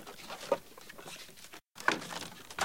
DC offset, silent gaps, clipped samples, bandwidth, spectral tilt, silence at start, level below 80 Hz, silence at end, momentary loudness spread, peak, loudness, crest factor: 0.1%; none; under 0.1%; 17 kHz; -2 dB/octave; 0 s; -70 dBFS; 0 s; 17 LU; -10 dBFS; -38 LUFS; 28 dB